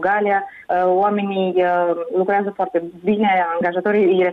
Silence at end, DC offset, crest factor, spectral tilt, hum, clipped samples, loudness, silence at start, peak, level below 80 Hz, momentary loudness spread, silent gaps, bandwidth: 0 s; under 0.1%; 10 dB; -8.5 dB/octave; none; under 0.1%; -18 LUFS; 0 s; -8 dBFS; -62 dBFS; 6 LU; none; 4.4 kHz